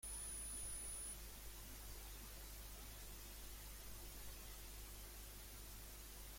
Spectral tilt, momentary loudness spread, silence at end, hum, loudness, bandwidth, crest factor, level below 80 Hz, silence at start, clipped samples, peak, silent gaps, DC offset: -2 dB/octave; 8 LU; 0 s; 50 Hz at -60 dBFS; -52 LUFS; 16.5 kHz; 14 dB; -58 dBFS; 0 s; under 0.1%; -38 dBFS; none; under 0.1%